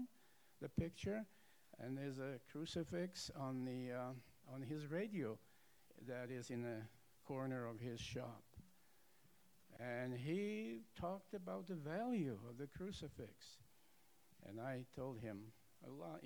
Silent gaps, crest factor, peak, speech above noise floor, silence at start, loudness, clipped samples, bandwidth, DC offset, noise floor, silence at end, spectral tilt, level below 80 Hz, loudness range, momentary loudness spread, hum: none; 20 dB; -30 dBFS; 27 dB; 0 s; -49 LUFS; under 0.1%; over 20 kHz; under 0.1%; -75 dBFS; 0 s; -6 dB/octave; -72 dBFS; 5 LU; 14 LU; none